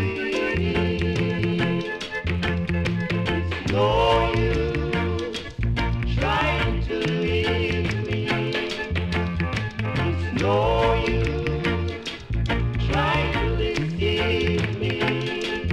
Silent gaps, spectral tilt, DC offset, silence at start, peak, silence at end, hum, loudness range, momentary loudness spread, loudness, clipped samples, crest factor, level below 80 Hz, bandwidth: none; -6.5 dB/octave; under 0.1%; 0 s; -8 dBFS; 0 s; none; 1 LU; 6 LU; -24 LUFS; under 0.1%; 14 dB; -32 dBFS; 11 kHz